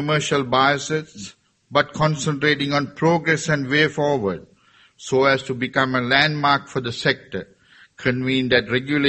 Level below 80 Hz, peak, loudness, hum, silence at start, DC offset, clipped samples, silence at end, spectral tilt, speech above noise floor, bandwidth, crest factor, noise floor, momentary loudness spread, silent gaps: -54 dBFS; -2 dBFS; -20 LUFS; none; 0 s; under 0.1%; under 0.1%; 0 s; -4.5 dB/octave; 35 dB; 8.8 kHz; 20 dB; -55 dBFS; 10 LU; none